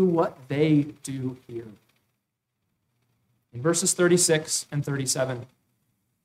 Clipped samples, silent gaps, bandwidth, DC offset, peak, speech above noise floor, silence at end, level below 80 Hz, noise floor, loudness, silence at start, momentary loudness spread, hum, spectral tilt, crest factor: under 0.1%; none; 16 kHz; under 0.1%; -10 dBFS; 55 dB; 0.8 s; -68 dBFS; -80 dBFS; -24 LUFS; 0 s; 18 LU; none; -4.5 dB/octave; 16 dB